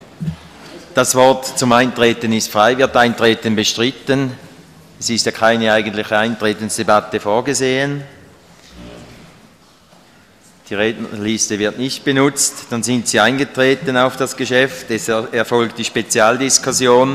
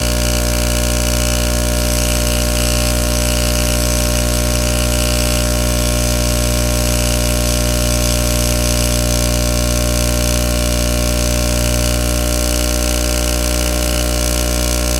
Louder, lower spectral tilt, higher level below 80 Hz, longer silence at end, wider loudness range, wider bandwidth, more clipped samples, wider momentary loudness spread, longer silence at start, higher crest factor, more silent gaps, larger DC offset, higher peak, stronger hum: about the same, -15 LUFS vs -15 LUFS; about the same, -3 dB/octave vs -3.5 dB/octave; second, -52 dBFS vs -18 dBFS; about the same, 0 s vs 0 s; first, 9 LU vs 1 LU; about the same, 15.5 kHz vs 17 kHz; neither; first, 9 LU vs 1 LU; first, 0.2 s vs 0 s; about the same, 16 dB vs 14 dB; neither; neither; about the same, 0 dBFS vs 0 dBFS; second, none vs 60 Hz at -15 dBFS